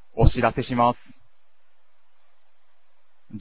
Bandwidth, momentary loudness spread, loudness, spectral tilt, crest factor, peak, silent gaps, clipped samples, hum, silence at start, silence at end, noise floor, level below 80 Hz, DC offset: 4 kHz; 16 LU; -22 LUFS; -11 dB/octave; 24 dB; -2 dBFS; none; under 0.1%; none; 0.15 s; 0 s; -70 dBFS; -34 dBFS; 0.8%